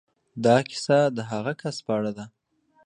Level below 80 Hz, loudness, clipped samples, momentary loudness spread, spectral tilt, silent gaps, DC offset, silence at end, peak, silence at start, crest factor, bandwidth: -68 dBFS; -24 LUFS; under 0.1%; 17 LU; -5.5 dB/octave; none; under 0.1%; 0.6 s; -6 dBFS; 0.35 s; 20 dB; 10.5 kHz